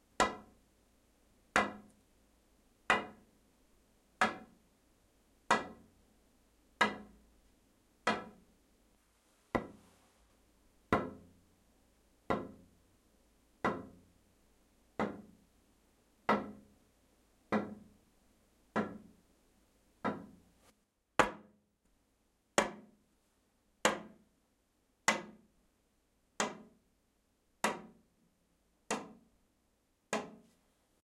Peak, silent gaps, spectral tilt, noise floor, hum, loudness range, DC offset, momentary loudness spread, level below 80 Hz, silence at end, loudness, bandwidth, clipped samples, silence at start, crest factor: -8 dBFS; none; -3.5 dB/octave; -76 dBFS; none; 6 LU; under 0.1%; 21 LU; -68 dBFS; 0.7 s; -37 LUFS; 16 kHz; under 0.1%; 0.2 s; 34 dB